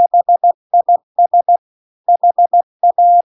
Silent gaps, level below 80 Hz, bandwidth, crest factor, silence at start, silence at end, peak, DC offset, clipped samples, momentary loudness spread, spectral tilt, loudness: 0.54-0.70 s, 1.03-1.15 s, 1.58-2.04 s, 2.63-2.80 s; -82 dBFS; 1.1 kHz; 8 dB; 0 s; 0.1 s; -4 dBFS; under 0.1%; under 0.1%; 5 LU; -8 dB/octave; -13 LUFS